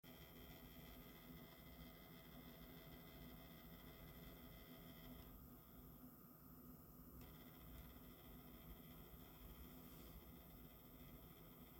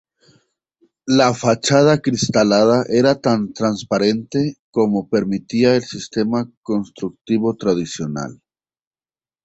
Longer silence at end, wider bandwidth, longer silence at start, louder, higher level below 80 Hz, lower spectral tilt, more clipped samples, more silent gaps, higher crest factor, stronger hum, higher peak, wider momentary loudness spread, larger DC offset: second, 0 s vs 1.1 s; first, 17 kHz vs 8.2 kHz; second, 0.05 s vs 1.05 s; second, -61 LUFS vs -18 LUFS; second, -68 dBFS vs -54 dBFS; about the same, -5.5 dB/octave vs -5.5 dB/octave; neither; second, none vs 4.59-4.73 s, 6.57-6.63 s; about the same, 16 dB vs 16 dB; neither; second, -46 dBFS vs -2 dBFS; second, 2 LU vs 11 LU; neither